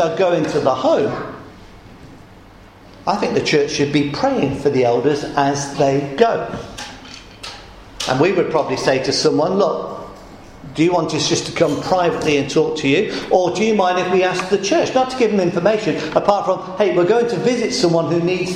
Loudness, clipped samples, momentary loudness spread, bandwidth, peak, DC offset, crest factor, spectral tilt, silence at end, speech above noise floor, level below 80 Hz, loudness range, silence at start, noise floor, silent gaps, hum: -17 LUFS; under 0.1%; 13 LU; 12 kHz; 0 dBFS; under 0.1%; 18 dB; -5 dB/octave; 0 s; 26 dB; -48 dBFS; 4 LU; 0 s; -42 dBFS; none; none